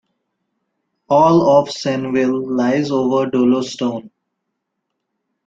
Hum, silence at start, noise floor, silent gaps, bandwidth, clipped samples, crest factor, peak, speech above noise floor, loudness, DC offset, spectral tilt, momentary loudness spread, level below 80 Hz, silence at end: none; 1.1 s; -76 dBFS; none; 7.8 kHz; under 0.1%; 16 dB; -2 dBFS; 60 dB; -16 LUFS; under 0.1%; -6.5 dB/octave; 10 LU; -58 dBFS; 1.4 s